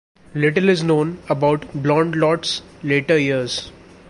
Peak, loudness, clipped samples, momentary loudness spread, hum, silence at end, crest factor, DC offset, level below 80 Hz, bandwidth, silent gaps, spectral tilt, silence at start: -4 dBFS; -19 LUFS; under 0.1%; 9 LU; none; 0.4 s; 16 dB; under 0.1%; -52 dBFS; 11.5 kHz; none; -5.5 dB/octave; 0.35 s